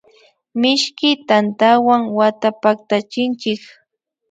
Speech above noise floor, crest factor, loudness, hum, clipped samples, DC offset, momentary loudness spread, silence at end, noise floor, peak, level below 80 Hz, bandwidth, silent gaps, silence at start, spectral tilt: 37 dB; 16 dB; -16 LUFS; none; under 0.1%; under 0.1%; 9 LU; 0.75 s; -53 dBFS; 0 dBFS; -68 dBFS; 9.2 kHz; none; 0.55 s; -4 dB/octave